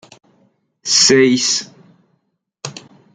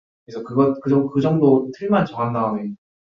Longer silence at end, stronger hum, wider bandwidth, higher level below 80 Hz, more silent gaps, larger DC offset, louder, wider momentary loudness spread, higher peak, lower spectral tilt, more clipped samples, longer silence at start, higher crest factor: about the same, 0.35 s vs 0.3 s; neither; first, 11 kHz vs 6.4 kHz; about the same, -60 dBFS vs -60 dBFS; neither; neither; first, -12 LUFS vs -19 LUFS; first, 21 LU vs 13 LU; about the same, 0 dBFS vs -2 dBFS; second, -2 dB/octave vs -9.5 dB/octave; neither; first, 0.85 s vs 0.3 s; about the same, 18 dB vs 18 dB